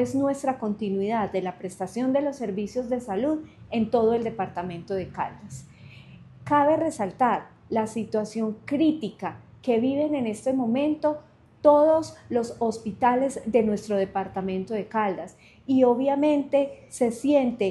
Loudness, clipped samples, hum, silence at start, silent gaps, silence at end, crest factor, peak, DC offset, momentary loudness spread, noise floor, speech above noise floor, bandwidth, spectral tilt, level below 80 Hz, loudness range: -25 LUFS; under 0.1%; none; 0 s; none; 0 s; 20 dB; -6 dBFS; under 0.1%; 11 LU; -47 dBFS; 23 dB; 12 kHz; -6.5 dB/octave; -60 dBFS; 4 LU